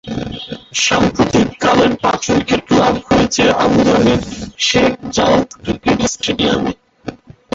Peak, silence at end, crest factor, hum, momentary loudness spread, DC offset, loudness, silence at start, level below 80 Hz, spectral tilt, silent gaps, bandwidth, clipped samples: 0 dBFS; 0.4 s; 14 dB; none; 12 LU; under 0.1%; -14 LUFS; 0.05 s; -36 dBFS; -4 dB/octave; none; 8 kHz; under 0.1%